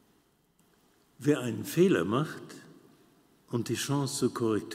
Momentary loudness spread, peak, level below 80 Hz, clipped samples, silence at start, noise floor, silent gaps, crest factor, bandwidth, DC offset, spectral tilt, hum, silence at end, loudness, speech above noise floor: 14 LU; -12 dBFS; -74 dBFS; under 0.1%; 1.2 s; -68 dBFS; none; 18 dB; 16 kHz; under 0.1%; -5.5 dB/octave; none; 0 s; -30 LUFS; 39 dB